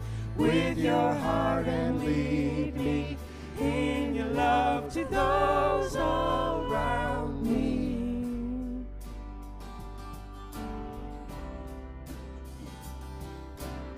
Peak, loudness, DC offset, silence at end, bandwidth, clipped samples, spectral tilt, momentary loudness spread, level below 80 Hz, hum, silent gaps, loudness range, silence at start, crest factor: -12 dBFS; -29 LUFS; under 0.1%; 0 s; 15.5 kHz; under 0.1%; -6.5 dB/octave; 17 LU; -40 dBFS; none; none; 14 LU; 0 s; 16 dB